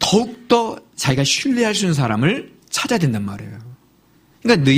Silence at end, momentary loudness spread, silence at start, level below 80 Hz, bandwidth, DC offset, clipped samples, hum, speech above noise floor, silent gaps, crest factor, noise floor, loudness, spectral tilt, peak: 0 s; 10 LU; 0 s; -52 dBFS; 15.5 kHz; under 0.1%; under 0.1%; none; 37 dB; none; 18 dB; -54 dBFS; -19 LUFS; -4.5 dB/octave; 0 dBFS